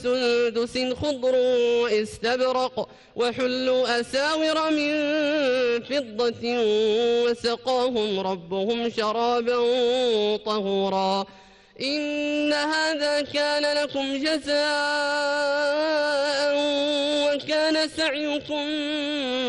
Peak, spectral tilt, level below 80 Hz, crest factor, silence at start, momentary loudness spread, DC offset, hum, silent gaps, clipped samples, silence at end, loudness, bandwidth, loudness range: -12 dBFS; -3.5 dB/octave; -60 dBFS; 10 dB; 0 s; 5 LU; under 0.1%; none; none; under 0.1%; 0 s; -24 LUFS; 11.5 kHz; 1 LU